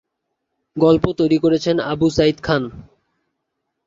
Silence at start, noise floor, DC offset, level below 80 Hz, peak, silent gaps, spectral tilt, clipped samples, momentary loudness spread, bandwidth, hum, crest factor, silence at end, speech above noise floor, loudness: 0.75 s; -76 dBFS; under 0.1%; -44 dBFS; -2 dBFS; none; -6.5 dB/octave; under 0.1%; 6 LU; 7.6 kHz; none; 18 dB; 1.05 s; 59 dB; -17 LUFS